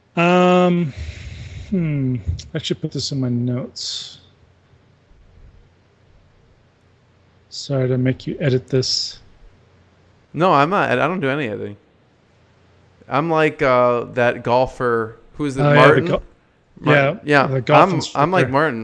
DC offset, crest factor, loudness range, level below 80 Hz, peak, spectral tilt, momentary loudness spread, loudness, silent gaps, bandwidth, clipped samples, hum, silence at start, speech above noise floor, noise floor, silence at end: under 0.1%; 20 dB; 11 LU; -44 dBFS; 0 dBFS; -6 dB/octave; 14 LU; -18 LUFS; none; 9.6 kHz; under 0.1%; none; 0.15 s; 38 dB; -55 dBFS; 0 s